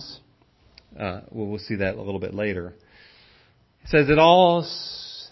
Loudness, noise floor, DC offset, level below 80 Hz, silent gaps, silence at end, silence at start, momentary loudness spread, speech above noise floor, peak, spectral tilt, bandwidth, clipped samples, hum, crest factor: -22 LUFS; -59 dBFS; under 0.1%; -48 dBFS; none; 0.05 s; 0 s; 18 LU; 38 dB; -2 dBFS; -6.5 dB/octave; 6 kHz; under 0.1%; none; 20 dB